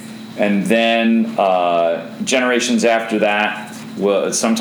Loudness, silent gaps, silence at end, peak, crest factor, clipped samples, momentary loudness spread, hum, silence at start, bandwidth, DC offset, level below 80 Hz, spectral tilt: -16 LUFS; none; 0 s; -2 dBFS; 16 dB; under 0.1%; 7 LU; none; 0 s; over 20 kHz; under 0.1%; -68 dBFS; -4 dB/octave